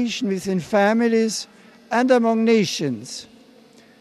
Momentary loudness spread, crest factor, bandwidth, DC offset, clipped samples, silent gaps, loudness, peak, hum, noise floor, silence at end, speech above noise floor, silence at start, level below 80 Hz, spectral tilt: 14 LU; 16 dB; 13 kHz; under 0.1%; under 0.1%; none; -20 LUFS; -6 dBFS; none; -50 dBFS; 0.75 s; 30 dB; 0 s; -66 dBFS; -5 dB/octave